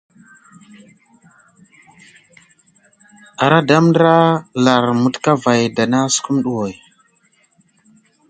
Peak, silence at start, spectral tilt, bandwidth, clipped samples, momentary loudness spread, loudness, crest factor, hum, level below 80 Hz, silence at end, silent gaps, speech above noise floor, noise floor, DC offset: 0 dBFS; 3.4 s; -5 dB/octave; 9.4 kHz; under 0.1%; 9 LU; -15 LUFS; 18 dB; none; -60 dBFS; 1.55 s; none; 44 dB; -58 dBFS; under 0.1%